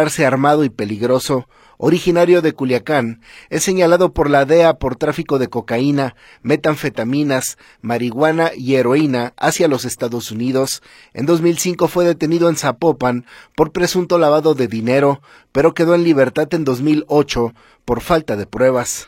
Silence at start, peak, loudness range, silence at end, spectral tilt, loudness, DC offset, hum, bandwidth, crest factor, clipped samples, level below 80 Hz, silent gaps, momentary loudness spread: 0 s; 0 dBFS; 3 LU; 0.05 s; -5.5 dB/octave; -16 LUFS; under 0.1%; none; 16.5 kHz; 16 dB; under 0.1%; -42 dBFS; none; 10 LU